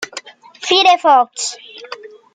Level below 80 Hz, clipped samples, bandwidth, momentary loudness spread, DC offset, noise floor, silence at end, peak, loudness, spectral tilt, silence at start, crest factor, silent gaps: -74 dBFS; under 0.1%; 9.6 kHz; 22 LU; under 0.1%; -35 dBFS; 0.25 s; -2 dBFS; -13 LUFS; 0.5 dB/octave; 0 s; 16 dB; none